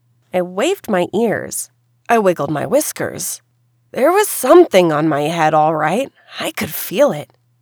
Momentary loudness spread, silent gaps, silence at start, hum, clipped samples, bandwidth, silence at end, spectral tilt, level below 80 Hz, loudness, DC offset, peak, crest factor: 13 LU; none; 0.35 s; none; under 0.1%; over 20 kHz; 0.4 s; -4.5 dB/octave; -62 dBFS; -16 LUFS; under 0.1%; 0 dBFS; 16 dB